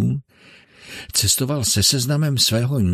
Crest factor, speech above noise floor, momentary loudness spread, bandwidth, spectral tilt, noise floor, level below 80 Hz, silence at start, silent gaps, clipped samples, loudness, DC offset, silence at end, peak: 16 dB; 31 dB; 13 LU; 14 kHz; -3.5 dB/octave; -50 dBFS; -46 dBFS; 0 s; none; under 0.1%; -18 LUFS; under 0.1%; 0 s; -4 dBFS